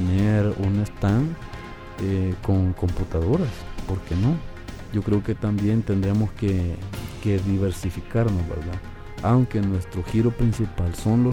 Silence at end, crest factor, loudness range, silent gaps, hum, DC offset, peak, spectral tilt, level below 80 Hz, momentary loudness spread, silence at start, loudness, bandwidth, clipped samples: 0 s; 14 dB; 1 LU; none; none; under 0.1%; -8 dBFS; -8 dB/octave; -36 dBFS; 11 LU; 0 s; -24 LUFS; 13 kHz; under 0.1%